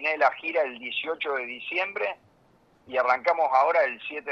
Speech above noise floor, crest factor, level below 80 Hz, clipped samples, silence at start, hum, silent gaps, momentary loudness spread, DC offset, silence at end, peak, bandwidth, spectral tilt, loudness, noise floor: 35 dB; 18 dB; -74 dBFS; under 0.1%; 0 s; none; none; 10 LU; under 0.1%; 0 s; -8 dBFS; 7 kHz; -3.5 dB/octave; -26 LUFS; -61 dBFS